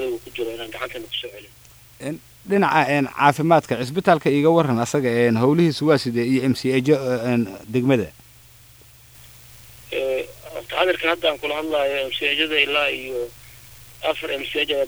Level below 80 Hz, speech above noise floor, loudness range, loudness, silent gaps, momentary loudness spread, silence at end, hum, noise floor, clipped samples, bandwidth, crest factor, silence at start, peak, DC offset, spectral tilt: -56 dBFS; 28 dB; 7 LU; -20 LUFS; none; 13 LU; 0 s; none; -48 dBFS; under 0.1%; over 20 kHz; 20 dB; 0 s; 0 dBFS; under 0.1%; -5.5 dB/octave